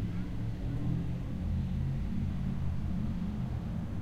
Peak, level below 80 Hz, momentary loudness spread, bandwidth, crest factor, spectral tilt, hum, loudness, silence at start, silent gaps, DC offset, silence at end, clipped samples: -22 dBFS; -40 dBFS; 3 LU; 8.4 kHz; 12 dB; -9 dB/octave; none; -36 LUFS; 0 s; none; under 0.1%; 0 s; under 0.1%